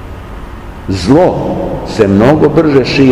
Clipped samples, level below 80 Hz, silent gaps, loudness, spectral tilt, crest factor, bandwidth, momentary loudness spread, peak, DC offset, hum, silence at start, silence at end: 3%; -28 dBFS; none; -10 LUFS; -7 dB/octave; 10 dB; 12 kHz; 20 LU; 0 dBFS; 0.7%; none; 0 s; 0 s